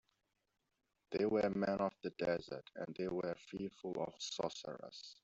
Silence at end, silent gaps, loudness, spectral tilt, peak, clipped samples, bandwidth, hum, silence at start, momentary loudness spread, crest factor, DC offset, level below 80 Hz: 0.1 s; none; -41 LUFS; -5 dB/octave; -22 dBFS; under 0.1%; 8.2 kHz; none; 1.1 s; 13 LU; 18 dB; under 0.1%; -74 dBFS